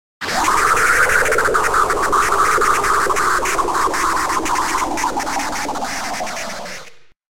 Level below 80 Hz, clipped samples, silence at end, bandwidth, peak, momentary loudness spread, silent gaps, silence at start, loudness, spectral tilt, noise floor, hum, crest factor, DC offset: -38 dBFS; under 0.1%; 0 s; 16.5 kHz; -2 dBFS; 10 LU; none; 0.2 s; -16 LUFS; -2 dB/octave; -41 dBFS; none; 16 dB; 3%